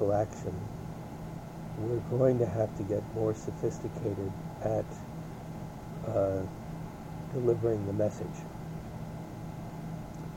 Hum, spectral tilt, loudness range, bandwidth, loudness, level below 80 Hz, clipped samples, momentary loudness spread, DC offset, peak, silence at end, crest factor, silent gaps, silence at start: none; -8 dB/octave; 3 LU; 17 kHz; -34 LUFS; -52 dBFS; under 0.1%; 13 LU; under 0.1%; -14 dBFS; 0 s; 20 dB; none; 0 s